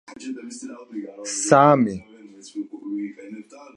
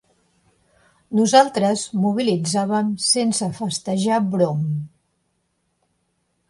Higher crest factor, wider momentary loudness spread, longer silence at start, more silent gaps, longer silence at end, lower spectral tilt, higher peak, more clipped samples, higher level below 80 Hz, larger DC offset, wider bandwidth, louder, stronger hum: about the same, 22 dB vs 22 dB; first, 22 LU vs 10 LU; second, 0.1 s vs 1.1 s; neither; second, 0.1 s vs 1.6 s; about the same, -5 dB/octave vs -4.5 dB/octave; about the same, 0 dBFS vs 0 dBFS; neither; about the same, -64 dBFS vs -64 dBFS; neither; about the same, 11.5 kHz vs 11.5 kHz; about the same, -20 LUFS vs -20 LUFS; neither